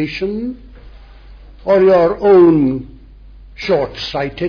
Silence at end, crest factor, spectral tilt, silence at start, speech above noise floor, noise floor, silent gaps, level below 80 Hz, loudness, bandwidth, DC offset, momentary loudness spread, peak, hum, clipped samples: 0 s; 14 dB; -7.5 dB/octave; 0 s; 25 dB; -38 dBFS; none; -38 dBFS; -13 LUFS; 5.4 kHz; under 0.1%; 18 LU; -2 dBFS; none; under 0.1%